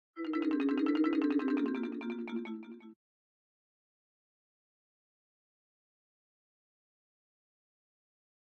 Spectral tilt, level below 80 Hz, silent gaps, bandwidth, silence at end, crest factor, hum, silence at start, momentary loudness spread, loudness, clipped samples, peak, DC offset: -6.5 dB/octave; -84 dBFS; none; 5.2 kHz; 5.55 s; 18 dB; none; 0.15 s; 14 LU; -33 LUFS; under 0.1%; -20 dBFS; under 0.1%